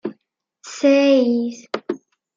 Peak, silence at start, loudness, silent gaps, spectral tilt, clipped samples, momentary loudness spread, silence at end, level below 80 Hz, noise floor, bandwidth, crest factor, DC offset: -4 dBFS; 0.05 s; -18 LUFS; none; -4 dB/octave; under 0.1%; 18 LU; 0.4 s; -76 dBFS; -68 dBFS; 7.6 kHz; 14 dB; under 0.1%